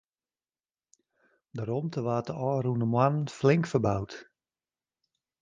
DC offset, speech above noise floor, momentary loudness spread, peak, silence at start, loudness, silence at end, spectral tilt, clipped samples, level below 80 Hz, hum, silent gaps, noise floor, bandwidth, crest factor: under 0.1%; over 62 dB; 13 LU; -10 dBFS; 1.55 s; -28 LUFS; 1.2 s; -7.5 dB/octave; under 0.1%; -60 dBFS; none; none; under -90 dBFS; 9.4 kHz; 22 dB